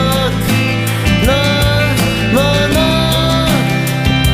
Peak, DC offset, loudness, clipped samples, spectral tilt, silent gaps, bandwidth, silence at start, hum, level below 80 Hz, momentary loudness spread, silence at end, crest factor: 0 dBFS; under 0.1%; -12 LUFS; under 0.1%; -5 dB/octave; none; 15.5 kHz; 0 s; none; -24 dBFS; 3 LU; 0 s; 12 dB